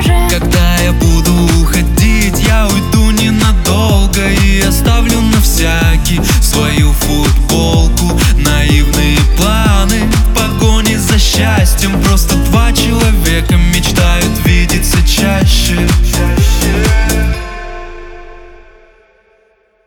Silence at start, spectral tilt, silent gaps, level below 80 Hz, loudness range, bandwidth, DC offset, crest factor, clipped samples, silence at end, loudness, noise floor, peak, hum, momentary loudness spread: 0 s; -4.5 dB/octave; none; -12 dBFS; 2 LU; 19 kHz; under 0.1%; 10 dB; under 0.1%; 1.3 s; -10 LUFS; -52 dBFS; 0 dBFS; none; 2 LU